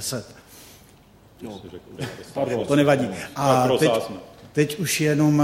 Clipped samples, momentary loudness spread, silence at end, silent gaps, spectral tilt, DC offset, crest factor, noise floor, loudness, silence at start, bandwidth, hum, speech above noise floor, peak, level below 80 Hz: under 0.1%; 21 LU; 0 s; none; -5 dB/octave; under 0.1%; 18 dB; -51 dBFS; -22 LUFS; 0 s; 16.5 kHz; none; 30 dB; -4 dBFS; -56 dBFS